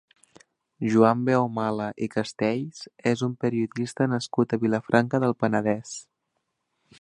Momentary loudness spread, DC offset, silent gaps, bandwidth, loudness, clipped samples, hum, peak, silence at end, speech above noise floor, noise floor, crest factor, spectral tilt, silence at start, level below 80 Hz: 10 LU; under 0.1%; none; 10.5 kHz; -25 LUFS; under 0.1%; none; -2 dBFS; 1 s; 54 dB; -78 dBFS; 22 dB; -6.5 dB/octave; 0.8 s; -66 dBFS